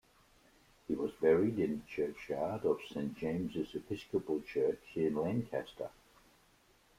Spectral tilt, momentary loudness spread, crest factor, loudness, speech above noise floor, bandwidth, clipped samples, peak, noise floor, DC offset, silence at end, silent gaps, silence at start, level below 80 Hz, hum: -7.5 dB/octave; 11 LU; 20 dB; -36 LUFS; 33 dB; 15.5 kHz; under 0.1%; -16 dBFS; -68 dBFS; under 0.1%; 1.1 s; none; 0.9 s; -66 dBFS; none